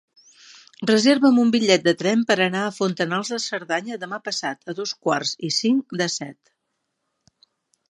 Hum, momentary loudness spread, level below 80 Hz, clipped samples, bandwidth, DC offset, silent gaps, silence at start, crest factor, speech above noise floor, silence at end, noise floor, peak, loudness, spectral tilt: none; 12 LU; -72 dBFS; under 0.1%; 11.5 kHz; under 0.1%; none; 0.8 s; 22 dB; 55 dB; 1.6 s; -77 dBFS; 0 dBFS; -21 LUFS; -4 dB/octave